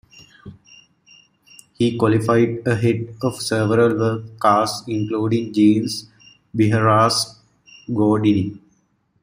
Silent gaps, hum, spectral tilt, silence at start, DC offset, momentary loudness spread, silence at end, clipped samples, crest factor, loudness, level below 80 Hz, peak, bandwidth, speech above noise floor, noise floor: none; none; -6 dB/octave; 0.45 s; under 0.1%; 10 LU; 0.65 s; under 0.1%; 18 dB; -19 LUFS; -56 dBFS; -2 dBFS; 16 kHz; 46 dB; -63 dBFS